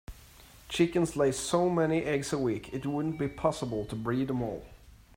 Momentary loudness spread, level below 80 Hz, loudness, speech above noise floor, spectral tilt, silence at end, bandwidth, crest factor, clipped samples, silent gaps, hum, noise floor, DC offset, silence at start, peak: 8 LU; -54 dBFS; -30 LUFS; 24 dB; -5.5 dB/octave; 0.25 s; 16 kHz; 18 dB; under 0.1%; none; none; -54 dBFS; under 0.1%; 0.1 s; -12 dBFS